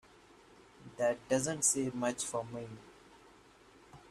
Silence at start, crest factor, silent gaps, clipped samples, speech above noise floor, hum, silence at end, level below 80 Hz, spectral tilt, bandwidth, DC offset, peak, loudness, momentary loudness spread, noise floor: 0.8 s; 22 dB; none; under 0.1%; 26 dB; none; 0 s; -70 dBFS; -3.5 dB/octave; 14.5 kHz; under 0.1%; -16 dBFS; -34 LUFS; 23 LU; -61 dBFS